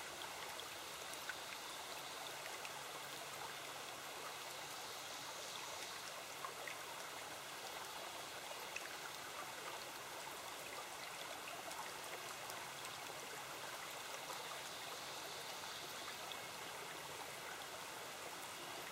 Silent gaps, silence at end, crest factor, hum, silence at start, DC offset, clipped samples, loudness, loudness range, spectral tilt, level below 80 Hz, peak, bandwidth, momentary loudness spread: none; 0 s; 22 dB; none; 0 s; under 0.1%; under 0.1%; -48 LUFS; 1 LU; -1 dB/octave; -82 dBFS; -28 dBFS; 16 kHz; 2 LU